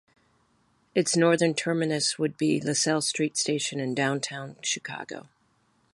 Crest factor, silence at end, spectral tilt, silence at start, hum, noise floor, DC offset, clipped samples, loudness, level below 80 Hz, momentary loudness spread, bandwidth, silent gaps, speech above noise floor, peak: 20 dB; 0.75 s; -3.5 dB/octave; 0.95 s; none; -68 dBFS; under 0.1%; under 0.1%; -26 LUFS; -74 dBFS; 11 LU; 11.5 kHz; none; 41 dB; -8 dBFS